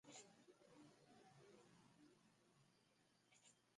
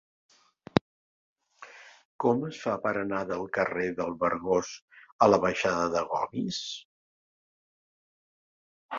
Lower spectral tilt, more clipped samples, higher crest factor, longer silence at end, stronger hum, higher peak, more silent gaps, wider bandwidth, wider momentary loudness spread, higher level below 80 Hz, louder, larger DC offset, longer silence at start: second, -3 dB/octave vs -5 dB/octave; neither; second, 22 dB vs 28 dB; about the same, 0 s vs 0 s; neither; second, -48 dBFS vs -2 dBFS; second, none vs 0.81-1.36 s, 2.05-2.19 s, 4.82-4.88 s, 5.12-5.19 s, 6.85-8.89 s; first, 11 kHz vs 7.6 kHz; second, 6 LU vs 16 LU; second, under -90 dBFS vs -62 dBFS; second, -68 LUFS vs -28 LUFS; neither; second, 0.05 s vs 0.75 s